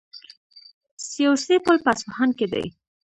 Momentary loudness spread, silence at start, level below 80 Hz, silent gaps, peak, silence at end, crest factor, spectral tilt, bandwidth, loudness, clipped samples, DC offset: 17 LU; 0.15 s; -62 dBFS; 0.37-0.50 s, 0.74-0.81 s, 0.91-0.97 s; -4 dBFS; 0.45 s; 20 dB; -4 dB/octave; 11 kHz; -21 LUFS; under 0.1%; under 0.1%